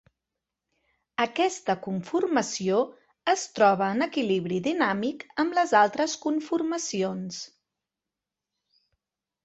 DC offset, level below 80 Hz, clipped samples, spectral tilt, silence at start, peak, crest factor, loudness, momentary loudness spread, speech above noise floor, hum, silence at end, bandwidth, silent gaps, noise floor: under 0.1%; -70 dBFS; under 0.1%; -4 dB/octave; 1.2 s; -6 dBFS; 22 dB; -26 LUFS; 10 LU; 63 dB; none; 2 s; 8.2 kHz; none; -88 dBFS